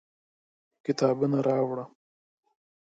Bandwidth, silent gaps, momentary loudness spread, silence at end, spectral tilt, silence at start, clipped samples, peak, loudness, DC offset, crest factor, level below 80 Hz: 7.8 kHz; none; 12 LU; 1 s; -7 dB/octave; 0.85 s; under 0.1%; -12 dBFS; -28 LUFS; under 0.1%; 18 dB; -76 dBFS